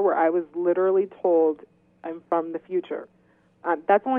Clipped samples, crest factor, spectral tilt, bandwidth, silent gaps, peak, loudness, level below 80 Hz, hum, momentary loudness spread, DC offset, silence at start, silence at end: under 0.1%; 18 dB; -9.5 dB/octave; 3.6 kHz; none; -6 dBFS; -24 LUFS; -74 dBFS; none; 16 LU; under 0.1%; 0 s; 0 s